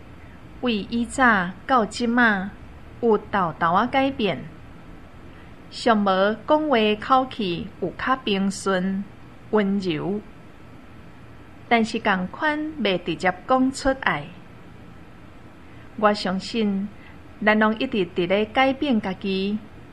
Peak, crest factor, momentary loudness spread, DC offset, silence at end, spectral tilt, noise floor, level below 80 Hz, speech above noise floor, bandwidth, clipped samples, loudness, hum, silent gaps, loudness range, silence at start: -2 dBFS; 22 dB; 10 LU; 0.4%; 0 s; -5.5 dB/octave; -45 dBFS; -50 dBFS; 23 dB; 11 kHz; under 0.1%; -22 LUFS; none; none; 5 LU; 0.05 s